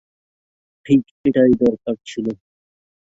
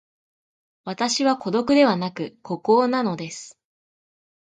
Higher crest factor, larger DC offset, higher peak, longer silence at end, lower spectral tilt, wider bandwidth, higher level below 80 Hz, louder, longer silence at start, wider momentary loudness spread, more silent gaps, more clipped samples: about the same, 18 dB vs 20 dB; neither; about the same, -2 dBFS vs -4 dBFS; second, 0.8 s vs 1 s; first, -7.5 dB/octave vs -4.5 dB/octave; second, 7.8 kHz vs 9.4 kHz; first, -52 dBFS vs -66 dBFS; first, -18 LUFS vs -21 LUFS; about the same, 0.85 s vs 0.85 s; second, 12 LU vs 17 LU; first, 1.11-1.24 s vs none; neither